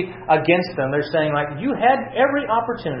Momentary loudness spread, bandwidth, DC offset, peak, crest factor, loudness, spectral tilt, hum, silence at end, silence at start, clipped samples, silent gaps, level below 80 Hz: 5 LU; 5.8 kHz; under 0.1%; -4 dBFS; 16 dB; -20 LUFS; -9.5 dB/octave; none; 0 s; 0 s; under 0.1%; none; -52 dBFS